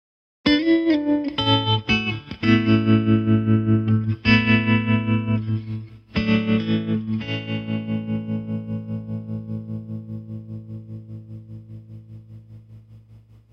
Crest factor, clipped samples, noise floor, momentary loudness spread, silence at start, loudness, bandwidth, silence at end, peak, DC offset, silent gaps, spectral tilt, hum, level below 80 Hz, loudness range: 18 dB; under 0.1%; -49 dBFS; 20 LU; 0.45 s; -21 LUFS; 6.4 kHz; 0.35 s; -4 dBFS; under 0.1%; none; -8 dB/octave; none; -48 dBFS; 17 LU